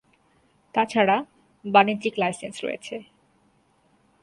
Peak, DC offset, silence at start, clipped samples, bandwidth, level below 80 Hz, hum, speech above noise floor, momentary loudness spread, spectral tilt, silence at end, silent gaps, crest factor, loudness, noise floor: -4 dBFS; under 0.1%; 0.75 s; under 0.1%; 11.5 kHz; -70 dBFS; none; 41 dB; 19 LU; -5 dB/octave; 1.2 s; none; 22 dB; -23 LUFS; -64 dBFS